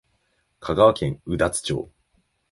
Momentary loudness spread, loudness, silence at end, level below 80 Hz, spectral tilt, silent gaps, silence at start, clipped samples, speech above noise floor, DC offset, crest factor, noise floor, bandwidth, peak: 16 LU; -22 LUFS; 0.65 s; -46 dBFS; -5 dB/octave; none; 0.6 s; under 0.1%; 48 dB; under 0.1%; 20 dB; -69 dBFS; 11.5 kHz; -4 dBFS